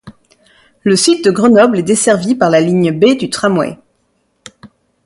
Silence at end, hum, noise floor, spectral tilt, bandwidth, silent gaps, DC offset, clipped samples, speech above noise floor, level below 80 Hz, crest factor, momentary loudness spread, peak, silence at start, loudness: 0.4 s; none; -61 dBFS; -4.5 dB/octave; 11.5 kHz; none; under 0.1%; under 0.1%; 50 dB; -54 dBFS; 12 dB; 6 LU; 0 dBFS; 0.05 s; -11 LUFS